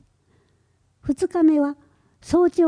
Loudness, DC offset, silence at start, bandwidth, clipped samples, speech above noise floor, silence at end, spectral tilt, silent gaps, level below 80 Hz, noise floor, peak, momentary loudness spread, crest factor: -21 LUFS; under 0.1%; 1.05 s; 10.5 kHz; under 0.1%; 45 dB; 0 s; -6.5 dB/octave; none; -52 dBFS; -64 dBFS; -8 dBFS; 14 LU; 14 dB